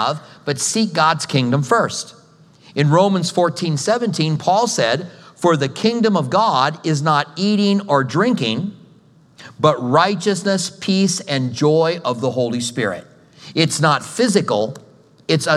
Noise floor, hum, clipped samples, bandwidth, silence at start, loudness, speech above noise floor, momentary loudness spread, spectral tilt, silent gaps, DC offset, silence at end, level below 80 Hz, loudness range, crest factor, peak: -50 dBFS; none; under 0.1%; 13.5 kHz; 0 s; -18 LUFS; 32 dB; 8 LU; -5 dB/octave; none; under 0.1%; 0 s; -68 dBFS; 2 LU; 18 dB; 0 dBFS